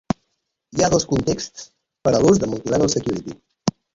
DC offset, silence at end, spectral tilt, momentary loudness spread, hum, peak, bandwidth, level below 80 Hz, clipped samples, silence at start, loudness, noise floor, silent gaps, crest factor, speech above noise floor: under 0.1%; 0.25 s; -5 dB/octave; 13 LU; none; -2 dBFS; 7.8 kHz; -44 dBFS; under 0.1%; 0.75 s; -20 LUFS; -74 dBFS; none; 18 dB; 55 dB